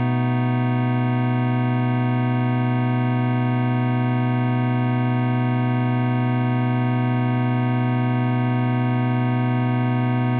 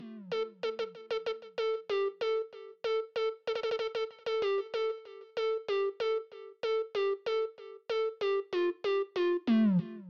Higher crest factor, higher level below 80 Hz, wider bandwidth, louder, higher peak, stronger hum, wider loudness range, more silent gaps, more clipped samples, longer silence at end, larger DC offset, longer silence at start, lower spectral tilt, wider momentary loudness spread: about the same, 10 dB vs 12 dB; first, -64 dBFS vs -80 dBFS; second, 4.3 kHz vs 7 kHz; first, -21 LUFS vs -33 LUFS; first, -10 dBFS vs -20 dBFS; neither; second, 0 LU vs 3 LU; neither; neither; about the same, 0 s vs 0 s; neither; about the same, 0 s vs 0 s; about the same, -7.5 dB/octave vs -7 dB/octave; second, 0 LU vs 8 LU